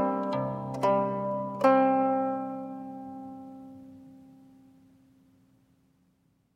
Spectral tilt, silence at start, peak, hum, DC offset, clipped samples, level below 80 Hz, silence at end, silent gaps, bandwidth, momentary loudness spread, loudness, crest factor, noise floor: -8 dB/octave; 0 s; -10 dBFS; none; under 0.1%; under 0.1%; -70 dBFS; 2.4 s; none; 10.5 kHz; 23 LU; -28 LUFS; 20 dB; -69 dBFS